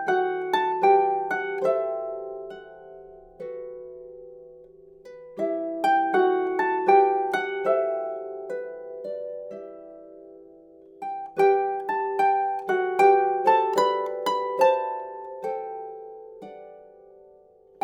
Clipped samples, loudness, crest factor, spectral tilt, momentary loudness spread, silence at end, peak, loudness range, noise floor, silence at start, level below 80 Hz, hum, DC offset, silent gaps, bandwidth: under 0.1%; -24 LUFS; 20 dB; -4.5 dB/octave; 23 LU; 1.05 s; -6 dBFS; 14 LU; -54 dBFS; 0 s; -70 dBFS; none; under 0.1%; none; 13 kHz